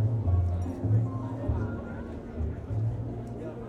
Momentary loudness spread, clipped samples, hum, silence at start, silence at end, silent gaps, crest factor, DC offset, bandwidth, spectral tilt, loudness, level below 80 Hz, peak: 11 LU; under 0.1%; none; 0 s; 0 s; none; 14 dB; under 0.1%; 5.8 kHz; -10 dB/octave; -31 LUFS; -42 dBFS; -16 dBFS